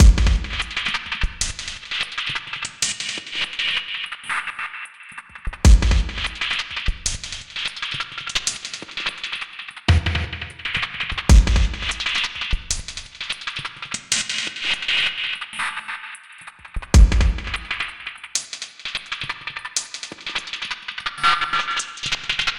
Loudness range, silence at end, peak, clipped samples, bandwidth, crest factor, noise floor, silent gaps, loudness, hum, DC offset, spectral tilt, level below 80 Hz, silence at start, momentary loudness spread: 4 LU; 0 s; -2 dBFS; under 0.1%; 11.5 kHz; 20 dB; -42 dBFS; none; -22 LUFS; none; 0.1%; -3 dB/octave; -24 dBFS; 0 s; 13 LU